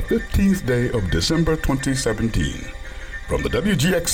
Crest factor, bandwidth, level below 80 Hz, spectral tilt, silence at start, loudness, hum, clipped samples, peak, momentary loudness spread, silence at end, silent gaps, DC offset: 12 dB; 17.5 kHz; -30 dBFS; -5 dB/octave; 0 s; -21 LUFS; none; under 0.1%; -8 dBFS; 14 LU; 0 s; none; under 0.1%